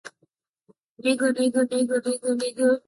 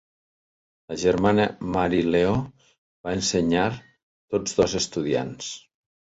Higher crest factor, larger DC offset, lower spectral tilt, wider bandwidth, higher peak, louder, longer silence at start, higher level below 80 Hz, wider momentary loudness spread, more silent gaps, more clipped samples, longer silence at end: about the same, 16 dB vs 18 dB; neither; second, -3 dB/octave vs -4.5 dB/octave; first, 11.5 kHz vs 8 kHz; second, -10 dBFS vs -6 dBFS; about the same, -24 LUFS vs -24 LUFS; second, 0.05 s vs 0.9 s; second, -74 dBFS vs -48 dBFS; second, 4 LU vs 14 LU; second, 0.49-0.54 s, 0.83-0.96 s vs 2.78-3.04 s, 4.03-4.28 s; neither; second, 0.1 s vs 0.55 s